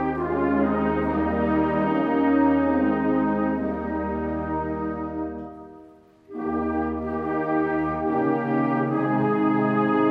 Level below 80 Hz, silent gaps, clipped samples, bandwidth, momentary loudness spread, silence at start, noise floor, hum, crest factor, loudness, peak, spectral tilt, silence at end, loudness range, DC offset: -46 dBFS; none; under 0.1%; 5 kHz; 8 LU; 0 s; -50 dBFS; none; 14 dB; -24 LUFS; -10 dBFS; -10 dB/octave; 0 s; 7 LU; under 0.1%